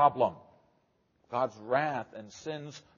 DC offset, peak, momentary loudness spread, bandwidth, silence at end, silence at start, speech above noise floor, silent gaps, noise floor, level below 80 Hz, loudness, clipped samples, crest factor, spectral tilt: under 0.1%; -10 dBFS; 12 LU; 7.2 kHz; 0.2 s; 0 s; 41 dB; none; -72 dBFS; -76 dBFS; -33 LUFS; under 0.1%; 22 dB; -4 dB/octave